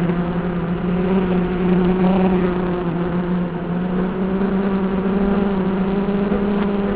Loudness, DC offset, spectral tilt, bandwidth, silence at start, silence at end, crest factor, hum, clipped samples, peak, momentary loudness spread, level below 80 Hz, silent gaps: -19 LUFS; 0.4%; -12.5 dB/octave; 4 kHz; 0 s; 0 s; 12 dB; none; under 0.1%; -6 dBFS; 5 LU; -36 dBFS; none